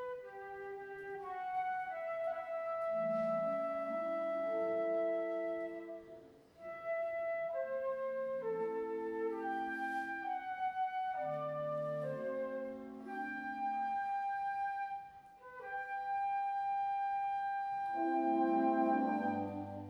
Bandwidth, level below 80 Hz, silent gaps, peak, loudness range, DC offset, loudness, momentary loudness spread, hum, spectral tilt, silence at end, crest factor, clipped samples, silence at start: 10 kHz; -78 dBFS; none; -22 dBFS; 5 LU; under 0.1%; -38 LUFS; 12 LU; none; -7.5 dB/octave; 0 s; 16 dB; under 0.1%; 0 s